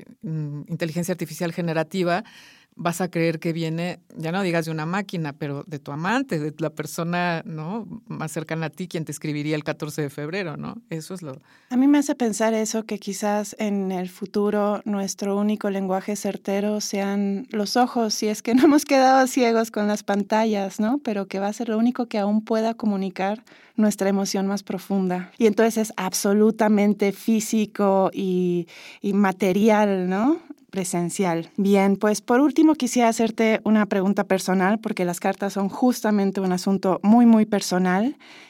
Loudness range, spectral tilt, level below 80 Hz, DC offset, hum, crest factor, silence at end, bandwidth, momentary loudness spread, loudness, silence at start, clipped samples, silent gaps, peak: 7 LU; -5.5 dB/octave; -72 dBFS; under 0.1%; none; 16 dB; 0.05 s; 16.5 kHz; 11 LU; -23 LUFS; 0 s; under 0.1%; none; -6 dBFS